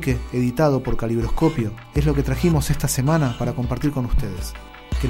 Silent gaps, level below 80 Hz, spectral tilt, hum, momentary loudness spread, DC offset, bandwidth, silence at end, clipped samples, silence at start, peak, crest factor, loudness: none; -28 dBFS; -6.5 dB/octave; none; 9 LU; under 0.1%; 16.5 kHz; 0 s; under 0.1%; 0 s; -6 dBFS; 14 dB; -22 LUFS